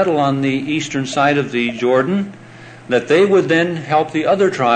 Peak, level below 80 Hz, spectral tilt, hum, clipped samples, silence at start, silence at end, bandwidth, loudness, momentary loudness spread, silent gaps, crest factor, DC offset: -2 dBFS; -60 dBFS; -5.5 dB/octave; none; under 0.1%; 0 s; 0 s; 9.2 kHz; -16 LUFS; 7 LU; none; 14 dB; under 0.1%